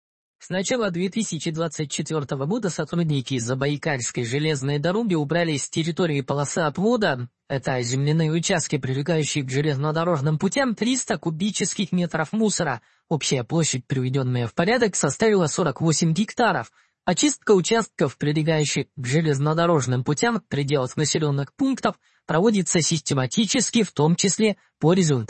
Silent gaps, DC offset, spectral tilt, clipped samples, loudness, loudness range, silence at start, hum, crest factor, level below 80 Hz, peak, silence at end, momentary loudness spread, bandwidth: none; under 0.1%; -4.5 dB/octave; under 0.1%; -23 LUFS; 3 LU; 0.4 s; none; 18 dB; -60 dBFS; -6 dBFS; 0.05 s; 6 LU; 8.8 kHz